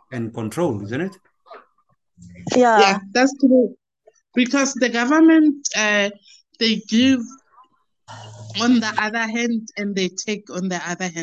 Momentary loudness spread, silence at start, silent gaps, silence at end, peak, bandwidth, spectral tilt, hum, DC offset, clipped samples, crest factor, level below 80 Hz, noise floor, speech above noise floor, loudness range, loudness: 13 LU; 0.1 s; none; 0 s; -2 dBFS; 11.5 kHz; -4 dB/octave; none; under 0.1%; under 0.1%; 18 dB; -62 dBFS; -66 dBFS; 48 dB; 6 LU; -19 LUFS